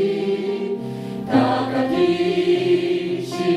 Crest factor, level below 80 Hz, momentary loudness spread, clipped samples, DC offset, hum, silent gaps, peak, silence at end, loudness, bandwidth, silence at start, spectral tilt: 14 dB; -58 dBFS; 8 LU; under 0.1%; under 0.1%; none; none; -6 dBFS; 0 s; -21 LUFS; 12 kHz; 0 s; -6.5 dB/octave